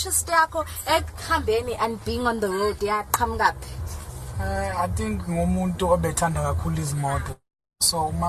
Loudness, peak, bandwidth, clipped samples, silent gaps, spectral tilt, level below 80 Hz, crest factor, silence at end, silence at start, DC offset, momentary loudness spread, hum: -24 LUFS; -4 dBFS; 14 kHz; under 0.1%; none; -4 dB/octave; -36 dBFS; 20 dB; 0 s; 0 s; under 0.1%; 11 LU; none